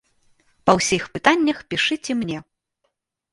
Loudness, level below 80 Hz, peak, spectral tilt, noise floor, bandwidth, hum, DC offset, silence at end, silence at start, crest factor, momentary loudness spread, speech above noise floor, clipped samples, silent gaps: -20 LUFS; -54 dBFS; 0 dBFS; -3.5 dB/octave; -74 dBFS; 11.5 kHz; none; under 0.1%; 0.9 s; 0.65 s; 22 dB; 8 LU; 54 dB; under 0.1%; none